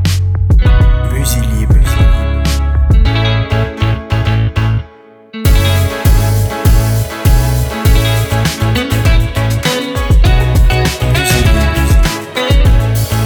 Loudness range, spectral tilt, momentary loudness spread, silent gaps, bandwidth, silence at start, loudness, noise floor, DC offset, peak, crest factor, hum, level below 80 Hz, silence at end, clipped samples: 2 LU; -5.5 dB/octave; 5 LU; none; over 20 kHz; 0 s; -12 LUFS; -38 dBFS; under 0.1%; 0 dBFS; 10 dB; none; -12 dBFS; 0 s; under 0.1%